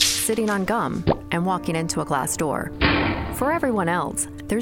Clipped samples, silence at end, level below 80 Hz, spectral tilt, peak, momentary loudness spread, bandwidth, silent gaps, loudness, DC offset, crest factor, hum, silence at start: under 0.1%; 0 s; -38 dBFS; -4 dB/octave; -4 dBFS; 5 LU; 19 kHz; none; -23 LUFS; under 0.1%; 18 dB; none; 0 s